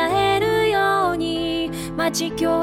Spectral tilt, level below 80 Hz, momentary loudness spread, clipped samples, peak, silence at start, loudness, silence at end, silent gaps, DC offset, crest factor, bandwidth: -4 dB/octave; -44 dBFS; 6 LU; under 0.1%; -8 dBFS; 0 s; -20 LUFS; 0 s; none; under 0.1%; 12 dB; 16.5 kHz